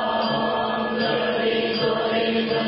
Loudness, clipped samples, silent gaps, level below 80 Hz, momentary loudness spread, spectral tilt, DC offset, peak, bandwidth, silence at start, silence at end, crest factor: -22 LUFS; under 0.1%; none; -56 dBFS; 1 LU; -9.5 dB/octave; under 0.1%; -10 dBFS; 5.8 kHz; 0 s; 0 s; 12 dB